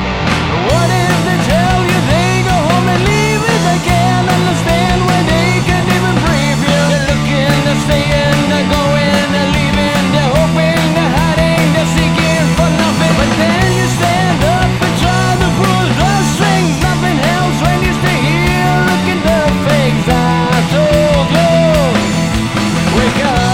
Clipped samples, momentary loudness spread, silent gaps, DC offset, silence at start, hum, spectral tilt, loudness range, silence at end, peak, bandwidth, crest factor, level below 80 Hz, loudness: under 0.1%; 2 LU; none; under 0.1%; 0 s; none; -5.5 dB/octave; 1 LU; 0 s; 0 dBFS; 16.5 kHz; 12 dB; -26 dBFS; -11 LUFS